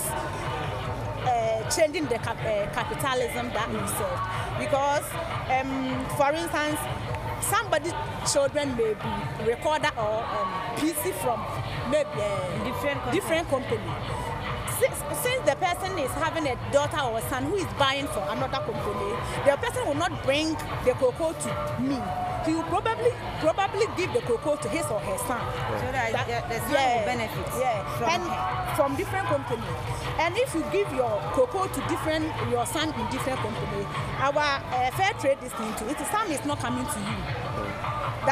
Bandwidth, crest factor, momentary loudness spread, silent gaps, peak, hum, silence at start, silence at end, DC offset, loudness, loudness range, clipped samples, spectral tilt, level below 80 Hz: 15.5 kHz; 20 dB; 6 LU; none; -6 dBFS; none; 0 s; 0 s; under 0.1%; -27 LUFS; 1 LU; under 0.1%; -4.5 dB/octave; -46 dBFS